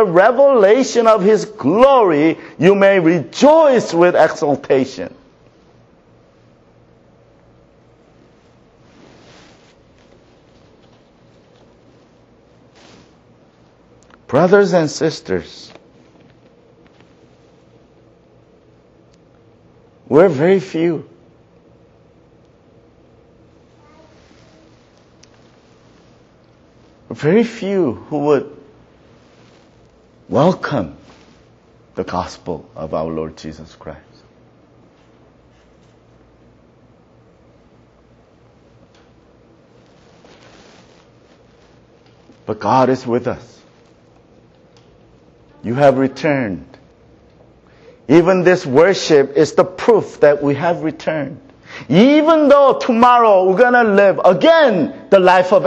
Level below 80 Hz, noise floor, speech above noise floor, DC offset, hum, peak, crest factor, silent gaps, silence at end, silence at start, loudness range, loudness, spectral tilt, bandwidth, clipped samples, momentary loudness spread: -54 dBFS; -49 dBFS; 37 dB; under 0.1%; none; 0 dBFS; 16 dB; none; 0 s; 0 s; 15 LU; -13 LUFS; -6 dB/octave; 8.2 kHz; under 0.1%; 18 LU